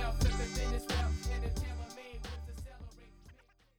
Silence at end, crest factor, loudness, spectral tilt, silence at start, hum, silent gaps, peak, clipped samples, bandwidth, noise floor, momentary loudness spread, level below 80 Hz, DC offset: 0.45 s; 18 dB; -38 LUFS; -5 dB/octave; 0 s; none; none; -18 dBFS; under 0.1%; 17.5 kHz; -61 dBFS; 17 LU; -38 dBFS; under 0.1%